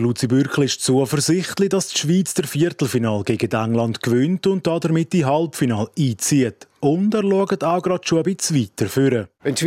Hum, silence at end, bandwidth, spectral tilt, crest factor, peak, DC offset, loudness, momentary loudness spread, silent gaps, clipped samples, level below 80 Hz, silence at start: none; 0 s; 16.5 kHz; -5 dB/octave; 14 dB; -4 dBFS; under 0.1%; -19 LUFS; 3 LU; none; under 0.1%; -60 dBFS; 0 s